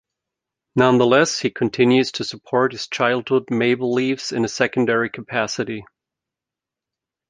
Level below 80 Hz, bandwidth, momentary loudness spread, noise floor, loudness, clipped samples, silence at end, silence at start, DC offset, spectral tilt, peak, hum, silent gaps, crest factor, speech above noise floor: -62 dBFS; 9.6 kHz; 8 LU; -87 dBFS; -19 LUFS; under 0.1%; 1.45 s; 0.75 s; under 0.1%; -4.5 dB/octave; -2 dBFS; none; none; 20 dB; 68 dB